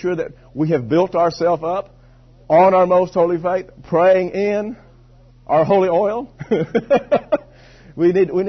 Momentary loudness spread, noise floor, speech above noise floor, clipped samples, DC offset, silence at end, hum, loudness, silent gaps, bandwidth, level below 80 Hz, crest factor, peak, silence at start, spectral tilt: 10 LU; -47 dBFS; 30 dB; under 0.1%; under 0.1%; 0 s; none; -17 LUFS; none; 6.4 kHz; -50 dBFS; 14 dB; -2 dBFS; 0 s; -8 dB/octave